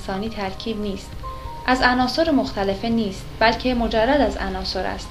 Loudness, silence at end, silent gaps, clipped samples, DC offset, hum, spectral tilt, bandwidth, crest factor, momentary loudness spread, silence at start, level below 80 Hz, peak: -21 LUFS; 0 s; none; under 0.1%; under 0.1%; none; -5 dB/octave; 14.5 kHz; 20 dB; 11 LU; 0 s; -36 dBFS; -2 dBFS